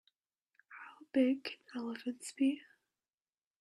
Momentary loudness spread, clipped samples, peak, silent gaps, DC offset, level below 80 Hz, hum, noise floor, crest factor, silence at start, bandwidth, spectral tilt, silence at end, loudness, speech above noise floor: 21 LU; under 0.1%; -20 dBFS; none; under 0.1%; -84 dBFS; none; under -90 dBFS; 18 dB; 0.7 s; 12 kHz; -3.5 dB/octave; 1 s; -37 LUFS; over 55 dB